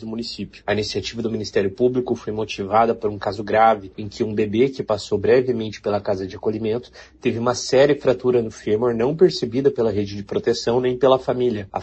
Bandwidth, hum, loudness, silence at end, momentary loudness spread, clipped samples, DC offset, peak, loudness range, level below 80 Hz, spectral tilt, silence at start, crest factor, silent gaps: 8.4 kHz; none; -21 LUFS; 0 s; 9 LU; under 0.1%; under 0.1%; -4 dBFS; 3 LU; -50 dBFS; -5.5 dB/octave; 0 s; 18 dB; none